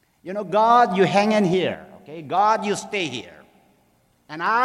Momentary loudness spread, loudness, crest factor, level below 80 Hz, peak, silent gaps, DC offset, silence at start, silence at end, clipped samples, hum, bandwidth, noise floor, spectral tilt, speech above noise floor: 19 LU; -20 LUFS; 16 dB; -66 dBFS; -4 dBFS; none; under 0.1%; 0.25 s; 0 s; under 0.1%; none; 13 kHz; -62 dBFS; -5 dB/octave; 42 dB